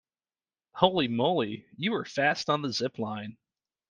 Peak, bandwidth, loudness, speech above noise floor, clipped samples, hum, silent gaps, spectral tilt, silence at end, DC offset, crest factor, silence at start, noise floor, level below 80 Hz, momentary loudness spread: -4 dBFS; 9.6 kHz; -28 LUFS; over 62 dB; under 0.1%; none; none; -5 dB/octave; 0.6 s; under 0.1%; 26 dB; 0.75 s; under -90 dBFS; -68 dBFS; 11 LU